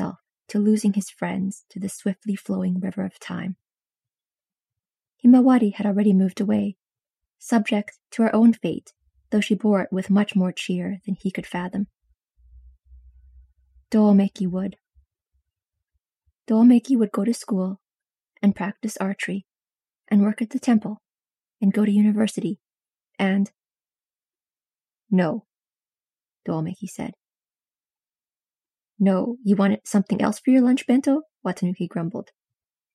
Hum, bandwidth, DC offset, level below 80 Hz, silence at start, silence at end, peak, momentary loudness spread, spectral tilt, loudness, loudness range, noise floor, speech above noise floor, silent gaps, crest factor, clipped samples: none; 12.5 kHz; under 0.1%; -62 dBFS; 0 s; 0.75 s; -6 dBFS; 14 LU; -7 dB/octave; -22 LUFS; 9 LU; under -90 dBFS; over 69 dB; none; 18 dB; under 0.1%